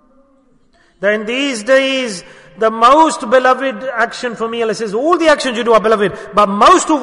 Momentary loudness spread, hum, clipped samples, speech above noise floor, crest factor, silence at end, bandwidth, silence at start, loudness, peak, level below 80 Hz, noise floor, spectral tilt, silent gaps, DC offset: 10 LU; none; under 0.1%; 39 dB; 14 dB; 0 s; 11 kHz; 1 s; -13 LUFS; 0 dBFS; -48 dBFS; -52 dBFS; -3.5 dB/octave; none; under 0.1%